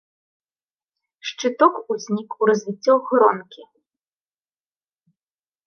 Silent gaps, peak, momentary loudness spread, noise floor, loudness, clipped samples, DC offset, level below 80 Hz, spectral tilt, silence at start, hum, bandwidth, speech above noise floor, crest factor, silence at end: none; -2 dBFS; 12 LU; under -90 dBFS; -20 LUFS; under 0.1%; under 0.1%; -80 dBFS; -5 dB/octave; 1.25 s; none; 6.8 kHz; over 71 dB; 22 dB; 2.05 s